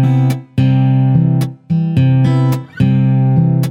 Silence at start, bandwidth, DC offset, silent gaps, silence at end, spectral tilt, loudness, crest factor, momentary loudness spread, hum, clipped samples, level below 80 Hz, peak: 0 s; 5.6 kHz; under 0.1%; none; 0 s; -9 dB/octave; -13 LUFS; 10 dB; 5 LU; none; under 0.1%; -46 dBFS; -2 dBFS